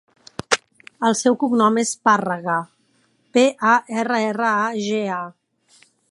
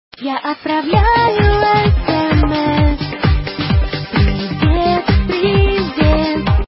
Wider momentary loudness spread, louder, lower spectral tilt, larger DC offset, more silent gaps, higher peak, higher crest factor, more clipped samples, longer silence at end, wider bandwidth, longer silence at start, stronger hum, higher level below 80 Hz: first, 10 LU vs 6 LU; second, -20 LUFS vs -15 LUFS; second, -3.5 dB/octave vs -11 dB/octave; neither; neither; about the same, 0 dBFS vs 0 dBFS; first, 20 dB vs 12 dB; neither; first, 0.8 s vs 0 s; first, 11.5 kHz vs 5.8 kHz; first, 0.5 s vs 0.2 s; neither; second, -66 dBFS vs -20 dBFS